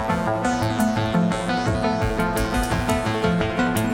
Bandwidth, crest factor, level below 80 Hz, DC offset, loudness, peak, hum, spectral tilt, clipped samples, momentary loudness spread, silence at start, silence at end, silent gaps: 19 kHz; 14 dB; -34 dBFS; under 0.1%; -22 LUFS; -6 dBFS; none; -5.5 dB/octave; under 0.1%; 1 LU; 0 s; 0 s; none